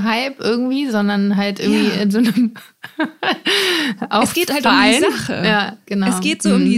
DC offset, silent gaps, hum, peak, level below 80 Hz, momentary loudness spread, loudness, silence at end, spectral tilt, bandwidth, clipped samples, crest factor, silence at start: under 0.1%; none; none; 0 dBFS; -56 dBFS; 7 LU; -16 LUFS; 0 s; -4.5 dB/octave; 16 kHz; under 0.1%; 16 dB; 0 s